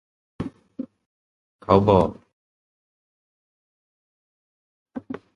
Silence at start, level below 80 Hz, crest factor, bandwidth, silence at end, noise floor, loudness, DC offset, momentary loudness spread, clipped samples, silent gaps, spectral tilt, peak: 0.4 s; -48 dBFS; 26 dB; 10.5 kHz; 0.2 s; -38 dBFS; -19 LUFS; under 0.1%; 23 LU; under 0.1%; 1.06-1.59 s, 2.33-4.86 s; -9 dB/octave; 0 dBFS